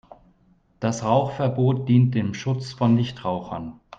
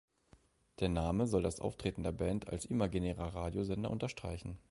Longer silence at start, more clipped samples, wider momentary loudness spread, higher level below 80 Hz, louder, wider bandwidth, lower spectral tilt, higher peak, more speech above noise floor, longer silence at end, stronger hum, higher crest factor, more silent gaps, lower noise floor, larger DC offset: about the same, 0.8 s vs 0.8 s; neither; first, 10 LU vs 6 LU; second, -56 dBFS vs -50 dBFS; first, -23 LUFS vs -38 LUFS; second, 7.8 kHz vs 11.5 kHz; about the same, -7.5 dB/octave vs -6.5 dB/octave; first, -6 dBFS vs -18 dBFS; first, 38 dB vs 31 dB; about the same, 0.05 s vs 0.1 s; neither; about the same, 16 dB vs 18 dB; neither; second, -60 dBFS vs -68 dBFS; neither